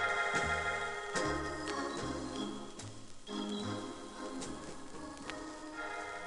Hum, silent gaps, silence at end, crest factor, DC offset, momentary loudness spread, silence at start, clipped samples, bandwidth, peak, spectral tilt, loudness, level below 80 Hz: none; none; 0 s; 18 dB; under 0.1%; 14 LU; 0 s; under 0.1%; 11.5 kHz; -22 dBFS; -3.5 dB/octave; -39 LUFS; -56 dBFS